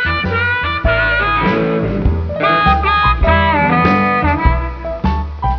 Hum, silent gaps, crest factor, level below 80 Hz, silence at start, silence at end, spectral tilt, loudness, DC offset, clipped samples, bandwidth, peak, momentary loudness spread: none; none; 14 dB; -22 dBFS; 0 s; 0 s; -8 dB/octave; -14 LUFS; under 0.1%; under 0.1%; 5.4 kHz; 0 dBFS; 7 LU